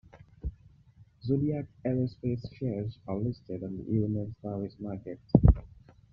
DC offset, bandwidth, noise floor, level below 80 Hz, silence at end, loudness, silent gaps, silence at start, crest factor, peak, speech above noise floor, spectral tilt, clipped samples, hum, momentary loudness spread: under 0.1%; 5.4 kHz; -58 dBFS; -38 dBFS; 0.45 s; -31 LUFS; none; 0.15 s; 24 dB; -6 dBFS; 27 dB; -10.5 dB/octave; under 0.1%; none; 17 LU